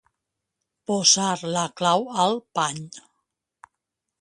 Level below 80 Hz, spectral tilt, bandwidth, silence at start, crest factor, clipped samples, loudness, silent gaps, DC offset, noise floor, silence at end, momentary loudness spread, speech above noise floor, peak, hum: -70 dBFS; -2.5 dB/octave; 11.5 kHz; 0.9 s; 22 dB; under 0.1%; -22 LUFS; none; under 0.1%; -83 dBFS; 1.2 s; 17 LU; 60 dB; -4 dBFS; none